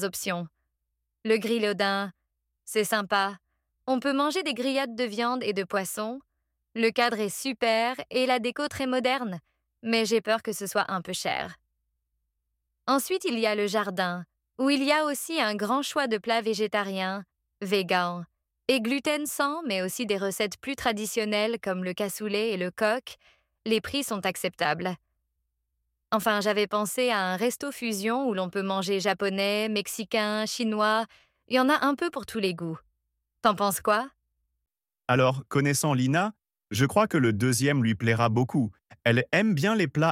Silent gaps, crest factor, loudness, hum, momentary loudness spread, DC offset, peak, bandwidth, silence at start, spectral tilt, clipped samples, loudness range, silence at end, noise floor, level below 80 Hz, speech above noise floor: none; 20 dB; -27 LUFS; none; 8 LU; under 0.1%; -8 dBFS; 16.5 kHz; 0 s; -4.5 dB/octave; under 0.1%; 4 LU; 0 s; -81 dBFS; -66 dBFS; 55 dB